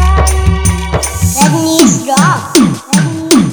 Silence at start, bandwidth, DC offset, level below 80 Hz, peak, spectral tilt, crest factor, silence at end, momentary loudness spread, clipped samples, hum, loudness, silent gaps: 0 s; over 20 kHz; 0.4%; -16 dBFS; 0 dBFS; -4.5 dB/octave; 10 dB; 0 s; 5 LU; 0.6%; none; -10 LUFS; none